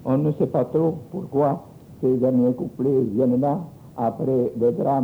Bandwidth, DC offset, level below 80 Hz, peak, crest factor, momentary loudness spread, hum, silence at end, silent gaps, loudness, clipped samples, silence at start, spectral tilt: over 20 kHz; under 0.1%; -58 dBFS; -8 dBFS; 14 dB; 7 LU; none; 0 s; none; -22 LUFS; under 0.1%; 0 s; -11 dB/octave